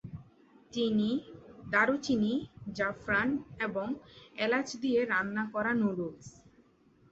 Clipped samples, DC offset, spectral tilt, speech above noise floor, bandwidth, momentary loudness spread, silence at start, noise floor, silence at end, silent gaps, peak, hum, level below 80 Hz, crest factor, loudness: under 0.1%; under 0.1%; -5.5 dB/octave; 33 dB; 8 kHz; 15 LU; 0.05 s; -64 dBFS; 0.8 s; none; -12 dBFS; none; -64 dBFS; 20 dB; -31 LUFS